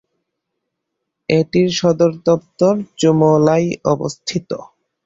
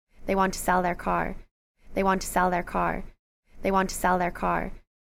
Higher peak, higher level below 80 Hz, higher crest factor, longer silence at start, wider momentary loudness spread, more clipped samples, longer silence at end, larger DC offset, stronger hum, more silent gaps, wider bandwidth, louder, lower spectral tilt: first, -2 dBFS vs -10 dBFS; second, -54 dBFS vs -40 dBFS; about the same, 16 dB vs 16 dB; first, 1.3 s vs 0.2 s; about the same, 12 LU vs 10 LU; neither; first, 0.45 s vs 0.3 s; neither; neither; second, none vs 1.51-1.75 s, 3.19-3.43 s; second, 8 kHz vs 16 kHz; first, -16 LUFS vs -27 LUFS; about the same, -6 dB/octave vs -5 dB/octave